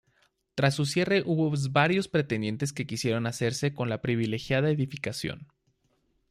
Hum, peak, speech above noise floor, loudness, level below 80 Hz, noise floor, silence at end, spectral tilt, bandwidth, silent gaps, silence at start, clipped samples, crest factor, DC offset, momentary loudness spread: none; -8 dBFS; 44 dB; -28 LUFS; -62 dBFS; -72 dBFS; 0.85 s; -5.5 dB/octave; 14.5 kHz; none; 0.55 s; under 0.1%; 20 dB; under 0.1%; 8 LU